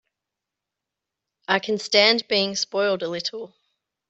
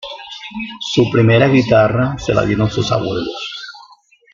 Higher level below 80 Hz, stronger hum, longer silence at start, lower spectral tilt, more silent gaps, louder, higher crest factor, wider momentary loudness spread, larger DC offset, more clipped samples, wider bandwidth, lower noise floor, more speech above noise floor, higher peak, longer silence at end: second, -72 dBFS vs -42 dBFS; neither; first, 1.5 s vs 0 s; second, -2.5 dB/octave vs -6.5 dB/octave; neither; second, -21 LUFS vs -15 LUFS; first, 22 dB vs 14 dB; about the same, 19 LU vs 17 LU; neither; neither; first, 8.2 kHz vs 7.4 kHz; first, -86 dBFS vs -47 dBFS; first, 63 dB vs 33 dB; about the same, -2 dBFS vs 0 dBFS; about the same, 0.6 s vs 0.5 s